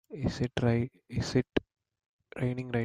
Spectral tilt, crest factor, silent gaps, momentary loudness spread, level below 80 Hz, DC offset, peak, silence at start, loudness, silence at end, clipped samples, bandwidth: -7 dB/octave; 20 dB; 2.06-2.19 s; 7 LU; -52 dBFS; under 0.1%; -12 dBFS; 0.1 s; -32 LUFS; 0 s; under 0.1%; 10.5 kHz